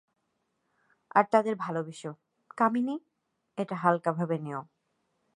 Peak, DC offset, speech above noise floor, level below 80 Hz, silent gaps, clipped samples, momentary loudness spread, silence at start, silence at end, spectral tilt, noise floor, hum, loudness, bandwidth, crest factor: -8 dBFS; under 0.1%; 50 dB; -82 dBFS; none; under 0.1%; 16 LU; 1.15 s; 0.7 s; -7.5 dB/octave; -78 dBFS; none; -29 LUFS; 11 kHz; 24 dB